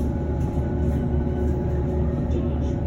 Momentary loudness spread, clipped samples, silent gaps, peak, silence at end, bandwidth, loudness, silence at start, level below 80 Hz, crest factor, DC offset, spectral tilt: 1 LU; under 0.1%; none; -10 dBFS; 0 s; 7 kHz; -25 LUFS; 0 s; -26 dBFS; 12 dB; under 0.1%; -10 dB/octave